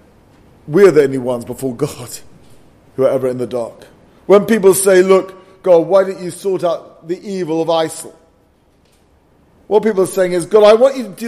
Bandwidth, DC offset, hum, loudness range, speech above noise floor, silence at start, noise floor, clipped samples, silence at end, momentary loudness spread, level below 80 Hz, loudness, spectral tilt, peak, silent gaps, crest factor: 15 kHz; under 0.1%; none; 8 LU; 40 dB; 0.65 s; -53 dBFS; under 0.1%; 0 s; 18 LU; -56 dBFS; -14 LUFS; -5 dB/octave; 0 dBFS; none; 14 dB